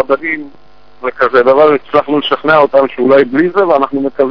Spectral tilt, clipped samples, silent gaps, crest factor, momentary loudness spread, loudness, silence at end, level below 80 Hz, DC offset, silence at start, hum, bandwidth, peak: -7.5 dB/octave; 0.6%; none; 10 dB; 8 LU; -10 LUFS; 0 s; -50 dBFS; 2%; 0 s; none; 5.4 kHz; 0 dBFS